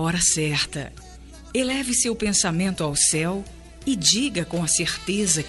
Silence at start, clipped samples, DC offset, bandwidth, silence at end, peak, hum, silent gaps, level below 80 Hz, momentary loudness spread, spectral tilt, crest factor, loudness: 0 s; under 0.1%; under 0.1%; 11.5 kHz; 0 s; -6 dBFS; none; none; -44 dBFS; 11 LU; -2.5 dB/octave; 18 dB; -21 LUFS